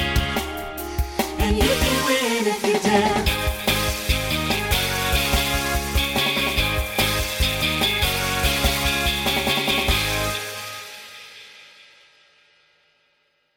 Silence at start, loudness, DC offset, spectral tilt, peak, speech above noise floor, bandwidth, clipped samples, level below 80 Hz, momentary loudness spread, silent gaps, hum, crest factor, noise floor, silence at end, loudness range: 0 s; -21 LUFS; under 0.1%; -3.5 dB/octave; -4 dBFS; 47 dB; 17.5 kHz; under 0.1%; -30 dBFS; 10 LU; none; none; 18 dB; -66 dBFS; 1.9 s; 5 LU